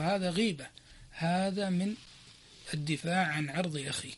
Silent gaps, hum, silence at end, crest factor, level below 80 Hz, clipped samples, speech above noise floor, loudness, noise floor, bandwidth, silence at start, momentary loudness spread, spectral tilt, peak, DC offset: none; none; 0 s; 16 dB; -62 dBFS; under 0.1%; 23 dB; -33 LUFS; -55 dBFS; 11.5 kHz; 0 s; 19 LU; -5 dB/octave; -16 dBFS; under 0.1%